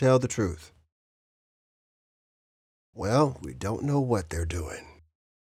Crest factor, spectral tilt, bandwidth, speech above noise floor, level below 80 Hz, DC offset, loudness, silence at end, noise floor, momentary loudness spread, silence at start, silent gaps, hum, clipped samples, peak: 20 dB; -6.5 dB/octave; 14.5 kHz; over 63 dB; -50 dBFS; under 0.1%; -28 LUFS; 0.65 s; under -90 dBFS; 12 LU; 0 s; 0.92-2.93 s; none; under 0.1%; -10 dBFS